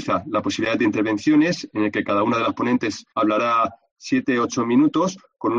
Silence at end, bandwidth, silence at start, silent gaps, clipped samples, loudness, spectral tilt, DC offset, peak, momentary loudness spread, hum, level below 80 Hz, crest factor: 0 s; 7.6 kHz; 0 s; 3.91-3.96 s; under 0.1%; -21 LUFS; -5.5 dB/octave; under 0.1%; -8 dBFS; 6 LU; none; -62 dBFS; 14 dB